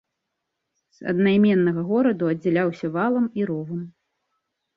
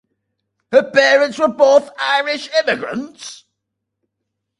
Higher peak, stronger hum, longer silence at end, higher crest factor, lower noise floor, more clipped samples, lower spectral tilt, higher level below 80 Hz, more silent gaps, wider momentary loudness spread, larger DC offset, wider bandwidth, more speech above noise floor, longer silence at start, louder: second, -8 dBFS vs 0 dBFS; neither; second, 0.85 s vs 1.25 s; about the same, 14 dB vs 18 dB; about the same, -80 dBFS vs -77 dBFS; neither; first, -9 dB/octave vs -2.5 dB/octave; about the same, -66 dBFS vs -64 dBFS; neither; about the same, 14 LU vs 16 LU; neither; second, 6 kHz vs 11 kHz; about the same, 59 dB vs 62 dB; first, 1 s vs 0.7 s; second, -22 LUFS vs -15 LUFS